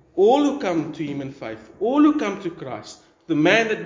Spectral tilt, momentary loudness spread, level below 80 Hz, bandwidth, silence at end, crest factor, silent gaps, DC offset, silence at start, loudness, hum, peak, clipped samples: -5.5 dB/octave; 18 LU; -60 dBFS; 7.6 kHz; 0 s; 18 dB; none; under 0.1%; 0.15 s; -21 LUFS; none; -4 dBFS; under 0.1%